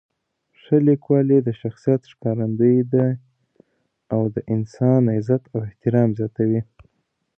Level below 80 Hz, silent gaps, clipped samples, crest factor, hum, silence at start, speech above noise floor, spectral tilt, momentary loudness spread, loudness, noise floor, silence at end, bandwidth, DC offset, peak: -58 dBFS; none; under 0.1%; 16 dB; none; 0.7 s; 53 dB; -11 dB/octave; 9 LU; -20 LUFS; -72 dBFS; 0.75 s; 6.4 kHz; under 0.1%; -4 dBFS